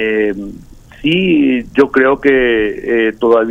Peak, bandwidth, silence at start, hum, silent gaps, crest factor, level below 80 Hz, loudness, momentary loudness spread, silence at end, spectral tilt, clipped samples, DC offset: 0 dBFS; 7.8 kHz; 0 s; none; none; 12 dB; -40 dBFS; -13 LUFS; 8 LU; 0 s; -7 dB/octave; under 0.1%; under 0.1%